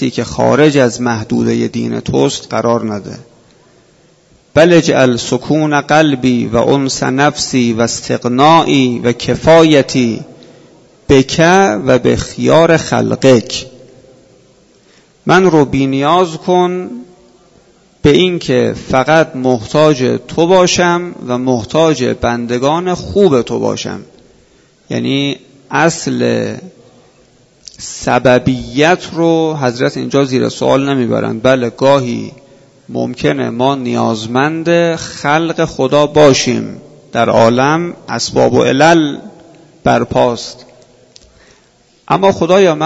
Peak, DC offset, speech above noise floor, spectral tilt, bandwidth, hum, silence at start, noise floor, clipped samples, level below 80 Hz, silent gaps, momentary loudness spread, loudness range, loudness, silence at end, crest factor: 0 dBFS; under 0.1%; 39 dB; -5 dB/octave; 8.2 kHz; none; 0 s; -50 dBFS; 0.3%; -42 dBFS; none; 11 LU; 5 LU; -12 LUFS; 0 s; 12 dB